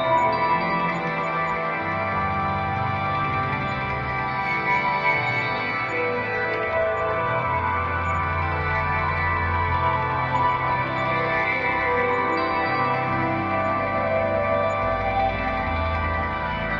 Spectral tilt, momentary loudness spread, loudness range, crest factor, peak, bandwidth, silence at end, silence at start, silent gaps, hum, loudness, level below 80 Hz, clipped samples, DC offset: -7 dB/octave; 3 LU; 2 LU; 14 dB; -10 dBFS; 7.4 kHz; 0 s; 0 s; none; none; -23 LUFS; -42 dBFS; under 0.1%; under 0.1%